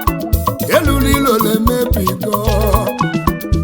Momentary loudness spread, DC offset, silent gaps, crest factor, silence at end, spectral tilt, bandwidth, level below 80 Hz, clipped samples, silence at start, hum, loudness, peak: 5 LU; under 0.1%; none; 14 dB; 0 s; -5.5 dB/octave; over 20 kHz; -22 dBFS; under 0.1%; 0 s; none; -15 LUFS; 0 dBFS